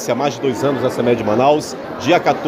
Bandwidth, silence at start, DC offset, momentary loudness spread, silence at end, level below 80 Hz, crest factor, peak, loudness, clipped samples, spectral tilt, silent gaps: 16 kHz; 0 s; under 0.1%; 5 LU; 0 s; -52 dBFS; 14 dB; -2 dBFS; -17 LUFS; under 0.1%; -5.5 dB/octave; none